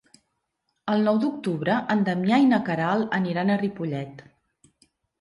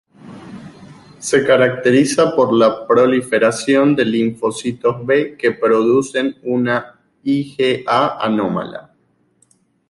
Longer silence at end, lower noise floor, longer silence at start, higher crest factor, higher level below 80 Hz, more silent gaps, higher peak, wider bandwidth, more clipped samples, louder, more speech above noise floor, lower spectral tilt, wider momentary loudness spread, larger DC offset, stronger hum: about the same, 1 s vs 1.1 s; first, -77 dBFS vs -60 dBFS; first, 0.85 s vs 0.25 s; about the same, 16 dB vs 16 dB; second, -68 dBFS vs -58 dBFS; neither; second, -8 dBFS vs -2 dBFS; about the same, 11 kHz vs 11.5 kHz; neither; second, -24 LUFS vs -16 LUFS; first, 54 dB vs 45 dB; first, -7.5 dB/octave vs -5 dB/octave; about the same, 11 LU vs 11 LU; neither; neither